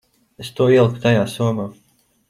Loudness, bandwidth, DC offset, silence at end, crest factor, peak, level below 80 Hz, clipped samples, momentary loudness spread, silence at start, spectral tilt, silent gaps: -17 LUFS; 14.5 kHz; under 0.1%; 0.6 s; 16 dB; -2 dBFS; -56 dBFS; under 0.1%; 18 LU; 0.4 s; -7 dB/octave; none